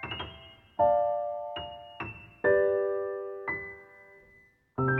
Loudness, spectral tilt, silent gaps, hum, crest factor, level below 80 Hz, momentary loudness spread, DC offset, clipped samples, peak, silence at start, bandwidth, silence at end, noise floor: -30 LUFS; -8.5 dB/octave; none; none; 18 dB; -58 dBFS; 17 LU; under 0.1%; under 0.1%; -14 dBFS; 0 s; 4.2 kHz; 0 s; -61 dBFS